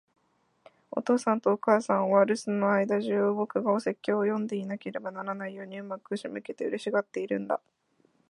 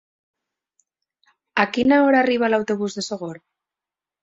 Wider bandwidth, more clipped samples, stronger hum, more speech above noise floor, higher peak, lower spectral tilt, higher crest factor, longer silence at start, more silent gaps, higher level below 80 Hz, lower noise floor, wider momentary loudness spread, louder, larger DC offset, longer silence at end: first, 11 kHz vs 7.8 kHz; neither; neither; second, 43 dB vs 70 dB; second, -8 dBFS vs -2 dBFS; first, -6.5 dB/octave vs -5 dB/octave; about the same, 20 dB vs 20 dB; second, 0.95 s vs 1.55 s; neither; second, -80 dBFS vs -62 dBFS; second, -71 dBFS vs -89 dBFS; about the same, 12 LU vs 13 LU; second, -29 LUFS vs -20 LUFS; neither; about the same, 0.75 s vs 0.85 s